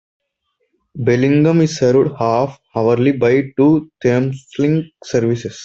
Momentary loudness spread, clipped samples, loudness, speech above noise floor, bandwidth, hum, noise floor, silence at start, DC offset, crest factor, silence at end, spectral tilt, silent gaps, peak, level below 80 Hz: 8 LU; under 0.1%; -16 LUFS; 54 dB; 8 kHz; none; -69 dBFS; 0.95 s; under 0.1%; 14 dB; 0 s; -7.5 dB/octave; none; -2 dBFS; -54 dBFS